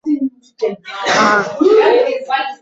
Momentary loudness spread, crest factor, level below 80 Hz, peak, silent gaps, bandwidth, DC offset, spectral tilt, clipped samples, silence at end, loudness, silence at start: 11 LU; 14 dB; -60 dBFS; -2 dBFS; none; 8 kHz; under 0.1%; -3.5 dB/octave; under 0.1%; 0.05 s; -14 LUFS; 0.05 s